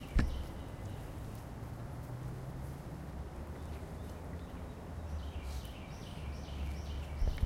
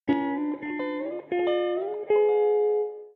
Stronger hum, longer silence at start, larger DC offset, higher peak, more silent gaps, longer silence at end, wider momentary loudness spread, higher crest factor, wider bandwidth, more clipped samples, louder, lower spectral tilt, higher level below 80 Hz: neither; about the same, 0 s vs 0.05 s; neither; second, -18 dBFS vs -12 dBFS; neither; about the same, 0 s vs 0.05 s; about the same, 7 LU vs 9 LU; first, 22 dB vs 12 dB; first, 16 kHz vs 4.3 kHz; neither; second, -44 LUFS vs -26 LUFS; second, -6.5 dB/octave vs -8.5 dB/octave; first, -42 dBFS vs -72 dBFS